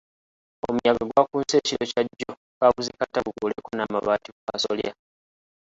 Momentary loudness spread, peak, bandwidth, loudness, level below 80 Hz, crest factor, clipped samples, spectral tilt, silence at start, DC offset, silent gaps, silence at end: 10 LU; -4 dBFS; 8 kHz; -25 LUFS; -58 dBFS; 22 dB; under 0.1%; -4 dB/octave; 0.65 s; under 0.1%; 2.37-2.61 s, 4.32-4.47 s; 0.7 s